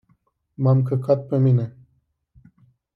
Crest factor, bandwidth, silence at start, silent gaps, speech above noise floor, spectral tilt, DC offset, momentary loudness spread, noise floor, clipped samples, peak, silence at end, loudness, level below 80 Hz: 16 dB; 4.9 kHz; 0.6 s; none; 48 dB; -12 dB/octave; under 0.1%; 5 LU; -67 dBFS; under 0.1%; -6 dBFS; 1.25 s; -20 LUFS; -64 dBFS